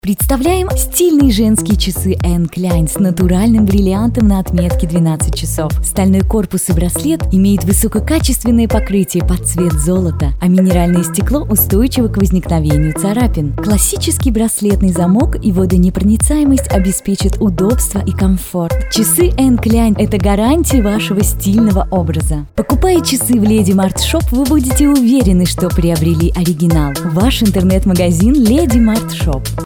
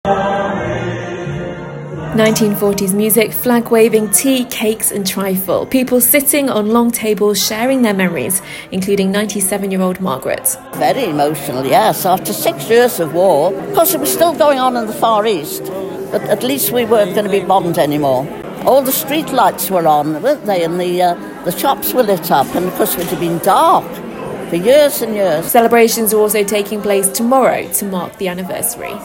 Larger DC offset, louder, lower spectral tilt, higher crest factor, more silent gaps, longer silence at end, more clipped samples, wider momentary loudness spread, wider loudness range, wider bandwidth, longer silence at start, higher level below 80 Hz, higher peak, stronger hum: neither; about the same, -12 LUFS vs -14 LUFS; first, -5.5 dB/octave vs -4 dB/octave; about the same, 12 dB vs 14 dB; neither; about the same, 0 s vs 0 s; neither; second, 5 LU vs 9 LU; about the same, 1 LU vs 3 LU; first, over 20 kHz vs 17 kHz; about the same, 0.05 s vs 0.05 s; first, -20 dBFS vs -48 dBFS; about the same, 0 dBFS vs 0 dBFS; neither